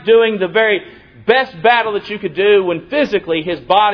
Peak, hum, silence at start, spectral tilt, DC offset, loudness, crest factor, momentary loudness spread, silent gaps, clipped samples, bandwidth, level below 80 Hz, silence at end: 0 dBFS; none; 0.05 s; -6.5 dB/octave; under 0.1%; -15 LUFS; 14 dB; 8 LU; none; under 0.1%; 5.4 kHz; -52 dBFS; 0 s